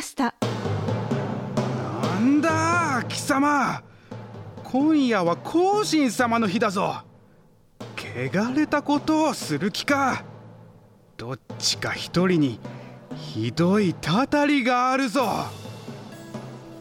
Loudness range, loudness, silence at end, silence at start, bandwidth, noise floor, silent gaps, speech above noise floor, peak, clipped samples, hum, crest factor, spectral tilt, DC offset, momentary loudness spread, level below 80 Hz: 3 LU; -23 LUFS; 0 s; 0 s; 16.5 kHz; -55 dBFS; none; 33 dB; -8 dBFS; under 0.1%; none; 16 dB; -5 dB/octave; under 0.1%; 18 LU; -58 dBFS